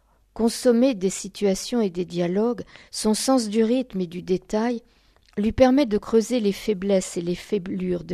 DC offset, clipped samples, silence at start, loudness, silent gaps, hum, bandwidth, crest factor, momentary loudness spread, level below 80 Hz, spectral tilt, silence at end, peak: under 0.1%; under 0.1%; 0.35 s; -23 LUFS; none; none; 14 kHz; 20 dB; 9 LU; -48 dBFS; -5 dB/octave; 0 s; -2 dBFS